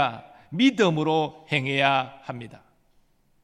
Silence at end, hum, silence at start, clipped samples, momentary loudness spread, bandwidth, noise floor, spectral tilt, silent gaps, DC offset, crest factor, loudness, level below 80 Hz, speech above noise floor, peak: 0.9 s; none; 0 s; under 0.1%; 18 LU; 10 kHz; -63 dBFS; -5.5 dB/octave; none; under 0.1%; 20 dB; -23 LUFS; -68 dBFS; 39 dB; -6 dBFS